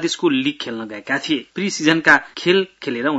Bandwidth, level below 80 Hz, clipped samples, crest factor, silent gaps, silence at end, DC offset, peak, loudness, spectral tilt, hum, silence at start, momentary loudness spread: 8 kHz; -62 dBFS; under 0.1%; 18 dB; none; 0 s; under 0.1%; 0 dBFS; -18 LUFS; -4 dB/octave; none; 0 s; 12 LU